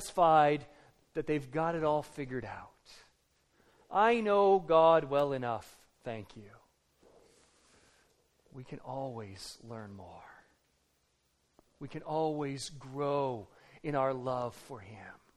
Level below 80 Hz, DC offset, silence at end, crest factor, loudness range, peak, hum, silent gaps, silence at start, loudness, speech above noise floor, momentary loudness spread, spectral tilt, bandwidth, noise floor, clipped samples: -64 dBFS; under 0.1%; 0.25 s; 20 dB; 18 LU; -14 dBFS; none; none; 0 s; -31 LUFS; 44 dB; 23 LU; -6 dB/octave; 13.5 kHz; -75 dBFS; under 0.1%